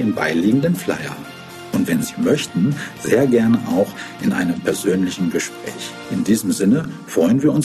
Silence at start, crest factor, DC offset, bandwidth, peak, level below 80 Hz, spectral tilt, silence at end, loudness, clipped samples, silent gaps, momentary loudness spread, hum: 0 s; 16 dB; under 0.1%; 13.5 kHz; -4 dBFS; -54 dBFS; -5.5 dB/octave; 0 s; -19 LUFS; under 0.1%; none; 11 LU; none